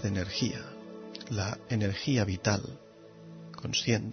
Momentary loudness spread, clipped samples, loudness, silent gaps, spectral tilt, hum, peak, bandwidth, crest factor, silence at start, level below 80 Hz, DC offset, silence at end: 19 LU; under 0.1%; -31 LUFS; none; -5 dB/octave; none; -12 dBFS; 6.6 kHz; 20 dB; 0 s; -58 dBFS; under 0.1%; 0 s